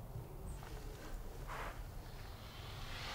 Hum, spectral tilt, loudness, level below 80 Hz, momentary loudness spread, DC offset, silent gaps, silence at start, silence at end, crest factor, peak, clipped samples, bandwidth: none; -4.5 dB/octave; -50 LUFS; -50 dBFS; 5 LU; under 0.1%; none; 0 s; 0 s; 14 dB; -32 dBFS; under 0.1%; 16 kHz